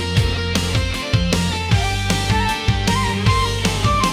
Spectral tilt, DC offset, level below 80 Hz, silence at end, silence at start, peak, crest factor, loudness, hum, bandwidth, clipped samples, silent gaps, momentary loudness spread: -4.5 dB/octave; under 0.1%; -26 dBFS; 0 s; 0 s; -4 dBFS; 14 dB; -18 LUFS; none; 16 kHz; under 0.1%; none; 2 LU